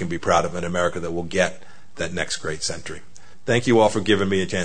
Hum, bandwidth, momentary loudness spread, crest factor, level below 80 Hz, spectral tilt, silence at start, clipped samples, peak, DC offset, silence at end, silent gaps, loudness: none; 9.6 kHz; 13 LU; 18 dB; -50 dBFS; -4.5 dB/octave; 0 s; under 0.1%; -4 dBFS; 3%; 0 s; none; -22 LUFS